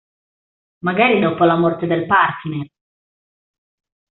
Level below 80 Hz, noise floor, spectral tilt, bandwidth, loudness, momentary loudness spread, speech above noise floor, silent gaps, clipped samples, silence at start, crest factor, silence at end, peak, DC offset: -60 dBFS; under -90 dBFS; -4.5 dB/octave; 4.2 kHz; -16 LUFS; 12 LU; over 74 dB; none; under 0.1%; 0.85 s; 16 dB; 1.5 s; -2 dBFS; under 0.1%